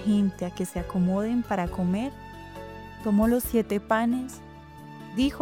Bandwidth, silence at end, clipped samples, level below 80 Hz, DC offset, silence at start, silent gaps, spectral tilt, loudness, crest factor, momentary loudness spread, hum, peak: 19.5 kHz; 0 s; under 0.1%; -46 dBFS; under 0.1%; 0 s; none; -6.5 dB/octave; -27 LUFS; 18 dB; 19 LU; none; -10 dBFS